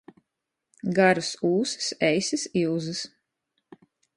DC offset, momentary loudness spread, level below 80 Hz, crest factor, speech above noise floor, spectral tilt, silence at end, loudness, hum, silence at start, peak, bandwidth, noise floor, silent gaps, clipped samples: under 0.1%; 12 LU; -68 dBFS; 22 dB; 59 dB; -4 dB/octave; 1.1 s; -25 LUFS; none; 0.85 s; -6 dBFS; 11 kHz; -84 dBFS; none; under 0.1%